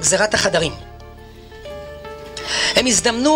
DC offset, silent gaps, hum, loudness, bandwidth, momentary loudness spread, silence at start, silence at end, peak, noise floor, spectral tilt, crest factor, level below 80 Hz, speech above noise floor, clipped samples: under 0.1%; none; none; -16 LUFS; 16 kHz; 21 LU; 0 s; 0 s; -2 dBFS; -39 dBFS; -2 dB/octave; 18 dB; -42 dBFS; 22 dB; under 0.1%